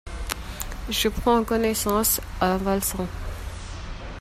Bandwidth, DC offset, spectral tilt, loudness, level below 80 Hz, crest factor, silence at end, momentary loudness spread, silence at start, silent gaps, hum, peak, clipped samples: 16 kHz; under 0.1%; -3.5 dB/octave; -24 LUFS; -36 dBFS; 22 dB; 0 s; 15 LU; 0.05 s; none; none; -4 dBFS; under 0.1%